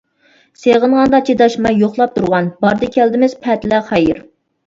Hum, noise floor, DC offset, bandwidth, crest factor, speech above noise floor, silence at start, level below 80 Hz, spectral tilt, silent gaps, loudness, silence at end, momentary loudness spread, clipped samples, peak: none; -53 dBFS; under 0.1%; 7.8 kHz; 14 dB; 40 dB; 0.6 s; -46 dBFS; -6.5 dB/octave; none; -13 LUFS; 0.5 s; 5 LU; under 0.1%; 0 dBFS